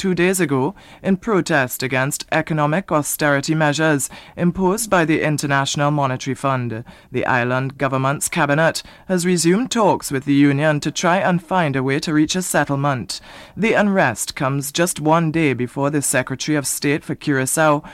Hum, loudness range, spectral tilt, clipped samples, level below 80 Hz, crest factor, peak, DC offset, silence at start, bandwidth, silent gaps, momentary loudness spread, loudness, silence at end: none; 2 LU; -4.5 dB/octave; under 0.1%; -50 dBFS; 16 dB; -4 dBFS; under 0.1%; 0 s; 16 kHz; none; 6 LU; -18 LUFS; 0 s